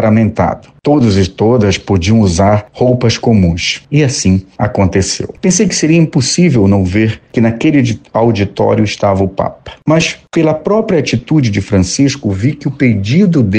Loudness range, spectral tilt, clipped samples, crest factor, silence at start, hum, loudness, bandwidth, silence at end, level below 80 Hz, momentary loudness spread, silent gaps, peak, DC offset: 2 LU; -5.5 dB/octave; under 0.1%; 10 dB; 0 s; none; -11 LUFS; 9.6 kHz; 0 s; -36 dBFS; 5 LU; none; 0 dBFS; under 0.1%